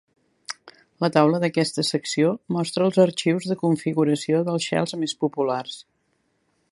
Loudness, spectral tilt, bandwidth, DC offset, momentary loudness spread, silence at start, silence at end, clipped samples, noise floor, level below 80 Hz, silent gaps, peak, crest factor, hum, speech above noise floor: -22 LUFS; -5.5 dB/octave; 11.5 kHz; under 0.1%; 17 LU; 0.5 s; 0.9 s; under 0.1%; -70 dBFS; -70 dBFS; none; -2 dBFS; 22 dB; none; 48 dB